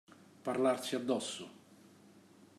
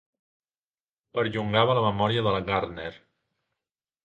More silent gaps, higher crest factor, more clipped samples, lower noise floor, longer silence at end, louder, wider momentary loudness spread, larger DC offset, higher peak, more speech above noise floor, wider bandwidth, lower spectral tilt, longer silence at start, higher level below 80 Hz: neither; second, 18 dB vs 24 dB; neither; second, -61 dBFS vs under -90 dBFS; second, 0.15 s vs 1.1 s; second, -36 LUFS vs -25 LUFS; about the same, 13 LU vs 12 LU; neither; second, -20 dBFS vs -6 dBFS; second, 26 dB vs over 65 dB; first, 14 kHz vs 8.6 kHz; second, -4 dB/octave vs -7.5 dB/octave; second, 0.1 s vs 1.15 s; second, -86 dBFS vs -54 dBFS